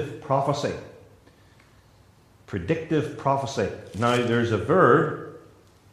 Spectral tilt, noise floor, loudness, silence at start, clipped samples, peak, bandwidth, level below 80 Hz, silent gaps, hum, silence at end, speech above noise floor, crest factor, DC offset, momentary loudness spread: -6.5 dB/octave; -56 dBFS; -24 LUFS; 0 s; under 0.1%; -6 dBFS; 13.5 kHz; -60 dBFS; none; none; 0.5 s; 32 dB; 20 dB; under 0.1%; 15 LU